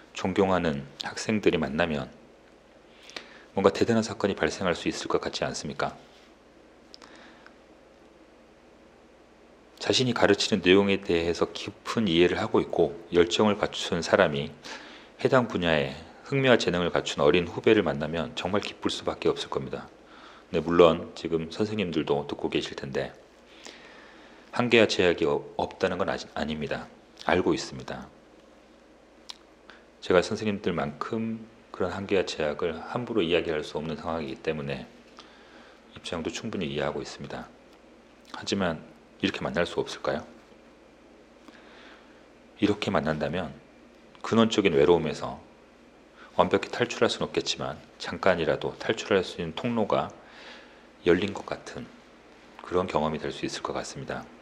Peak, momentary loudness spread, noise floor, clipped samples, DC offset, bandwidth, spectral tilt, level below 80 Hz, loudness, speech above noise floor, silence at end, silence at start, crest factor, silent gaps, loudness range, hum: -2 dBFS; 17 LU; -55 dBFS; under 0.1%; under 0.1%; 11 kHz; -5 dB/octave; -56 dBFS; -27 LUFS; 28 dB; 0.05 s; 0.15 s; 26 dB; none; 8 LU; none